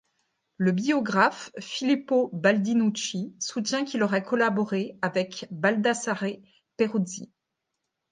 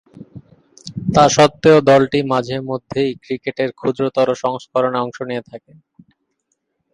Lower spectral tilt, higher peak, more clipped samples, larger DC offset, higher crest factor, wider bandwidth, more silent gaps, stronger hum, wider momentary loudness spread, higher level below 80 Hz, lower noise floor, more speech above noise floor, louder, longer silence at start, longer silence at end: about the same, -4.5 dB/octave vs -5 dB/octave; second, -6 dBFS vs 0 dBFS; neither; neither; about the same, 20 dB vs 18 dB; second, 9.6 kHz vs 11 kHz; neither; neither; second, 9 LU vs 15 LU; second, -74 dBFS vs -52 dBFS; first, -82 dBFS vs -71 dBFS; about the same, 56 dB vs 55 dB; second, -26 LUFS vs -16 LUFS; first, 0.6 s vs 0.15 s; second, 0.85 s vs 1.35 s